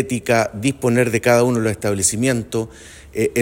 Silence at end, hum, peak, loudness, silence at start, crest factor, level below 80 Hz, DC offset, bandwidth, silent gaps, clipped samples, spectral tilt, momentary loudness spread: 0 s; none; -2 dBFS; -18 LUFS; 0 s; 16 dB; -48 dBFS; under 0.1%; 16.5 kHz; none; under 0.1%; -4.5 dB/octave; 10 LU